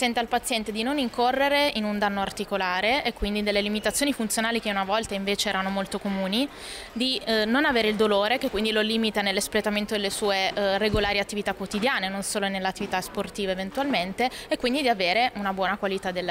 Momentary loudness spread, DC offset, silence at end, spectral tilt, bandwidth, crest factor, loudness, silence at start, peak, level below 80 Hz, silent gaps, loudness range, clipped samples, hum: 7 LU; under 0.1%; 0 s; -3.5 dB/octave; 16 kHz; 14 dB; -25 LUFS; 0 s; -12 dBFS; -48 dBFS; none; 3 LU; under 0.1%; none